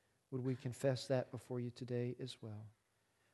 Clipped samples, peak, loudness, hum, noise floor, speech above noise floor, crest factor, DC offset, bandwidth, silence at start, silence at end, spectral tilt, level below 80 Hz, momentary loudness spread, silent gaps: under 0.1%; -24 dBFS; -43 LUFS; none; -79 dBFS; 37 dB; 20 dB; under 0.1%; 12 kHz; 0.3 s; 0.6 s; -6.5 dB/octave; -78 dBFS; 12 LU; none